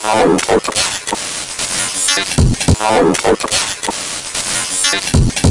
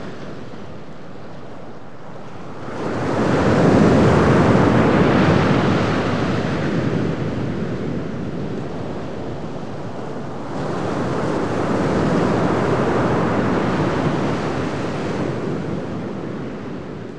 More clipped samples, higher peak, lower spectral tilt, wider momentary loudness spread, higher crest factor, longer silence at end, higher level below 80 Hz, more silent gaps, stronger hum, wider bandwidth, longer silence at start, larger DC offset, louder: neither; about the same, 0 dBFS vs -2 dBFS; second, -3.5 dB/octave vs -7.5 dB/octave; second, 7 LU vs 21 LU; about the same, 14 dB vs 18 dB; about the same, 0 s vs 0 s; first, -26 dBFS vs -40 dBFS; neither; neither; first, 12 kHz vs 10.5 kHz; about the same, 0 s vs 0 s; second, under 0.1% vs 3%; first, -14 LUFS vs -20 LUFS